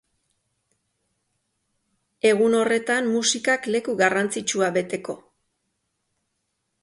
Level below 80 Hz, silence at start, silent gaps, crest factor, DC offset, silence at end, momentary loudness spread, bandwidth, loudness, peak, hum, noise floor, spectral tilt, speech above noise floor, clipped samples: -70 dBFS; 2.25 s; none; 20 dB; under 0.1%; 1.65 s; 10 LU; 11.5 kHz; -22 LUFS; -6 dBFS; none; -76 dBFS; -3 dB/octave; 54 dB; under 0.1%